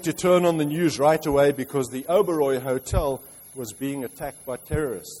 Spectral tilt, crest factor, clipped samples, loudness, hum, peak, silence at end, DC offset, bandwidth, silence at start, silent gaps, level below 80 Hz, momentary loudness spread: -5.5 dB/octave; 16 dB; under 0.1%; -23 LUFS; none; -8 dBFS; 0 s; under 0.1%; 16 kHz; 0 s; none; -40 dBFS; 15 LU